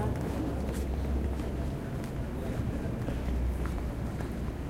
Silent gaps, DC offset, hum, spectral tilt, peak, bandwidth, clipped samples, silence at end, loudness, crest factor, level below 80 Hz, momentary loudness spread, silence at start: none; under 0.1%; none; -7.5 dB/octave; -20 dBFS; 15.5 kHz; under 0.1%; 0 s; -34 LUFS; 14 dB; -36 dBFS; 3 LU; 0 s